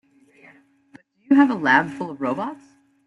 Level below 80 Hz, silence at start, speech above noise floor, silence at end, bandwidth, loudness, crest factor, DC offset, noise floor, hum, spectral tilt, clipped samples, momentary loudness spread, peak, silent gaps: -68 dBFS; 1.3 s; 34 dB; 0.55 s; 7.2 kHz; -20 LUFS; 20 dB; under 0.1%; -53 dBFS; none; -6.5 dB/octave; under 0.1%; 13 LU; -4 dBFS; none